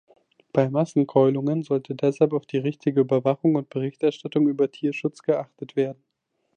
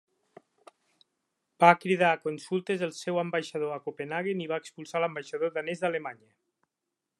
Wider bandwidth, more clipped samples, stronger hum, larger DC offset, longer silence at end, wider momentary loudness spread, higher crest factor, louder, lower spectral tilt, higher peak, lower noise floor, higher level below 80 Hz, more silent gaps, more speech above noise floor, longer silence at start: second, 9.2 kHz vs 12 kHz; neither; neither; neither; second, 0.65 s vs 1.05 s; second, 6 LU vs 13 LU; second, 18 dB vs 26 dB; first, -24 LUFS vs -29 LUFS; first, -8.5 dB/octave vs -5.5 dB/octave; about the same, -4 dBFS vs -4 dBFS; second, -75 dBFS vs -86 dBFS; first, -74 dBFS vs -84 dBFS; neither; second, 52 dB vs 57 dB; second, 0.55 s vs 1.6 s